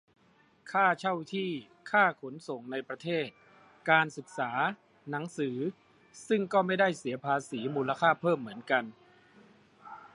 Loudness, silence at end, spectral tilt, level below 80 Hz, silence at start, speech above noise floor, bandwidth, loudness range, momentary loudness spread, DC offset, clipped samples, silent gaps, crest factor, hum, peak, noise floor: -31 LUFS; 0.05 s; -5.5 dB/octave; -80 dBFS; 0.65 s; 35 dB; 11.5 kHz; 2 LU; 14 LU; under 0.1%; under 0.1%; none; 22 dB; none; -10 dBFS; -65 dBFS